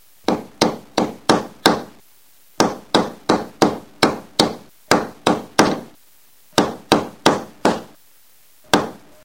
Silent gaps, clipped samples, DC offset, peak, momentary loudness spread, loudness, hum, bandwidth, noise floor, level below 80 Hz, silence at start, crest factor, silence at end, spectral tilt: none; under 0.1%; 0.4%; 0 dBFS; 6 LU; -19 LUFS; none; 17 kHz; -54 dBFS; -52 dBFS; 0.3 s; 20 dB; 0.3 s; -4 dB/octave